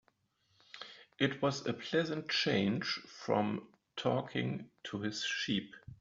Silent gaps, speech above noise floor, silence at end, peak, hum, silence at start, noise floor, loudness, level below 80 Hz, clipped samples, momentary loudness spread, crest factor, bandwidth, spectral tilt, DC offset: none; 40 dB; 0.05 s; -16 dBFS; none; 0.75 s; -76 dBFS; -35 LUFS; -72 dBFS; under 0.1%; 17 LU; 22 dB; 7.4 kHz; -3.5 dB/octave; under 0.1%